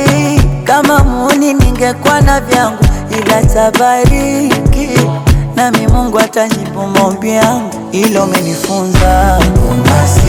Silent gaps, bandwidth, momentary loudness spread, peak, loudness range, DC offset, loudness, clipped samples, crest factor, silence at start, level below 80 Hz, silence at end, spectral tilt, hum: none; 19.5 kHz; 4 LU; 0 dBFS; 2 LU; under 0.1%; -10 LUFS; 1%; 8 dB; 0 s; -16 dBFS; 0 s; -5.5 dB/octave; none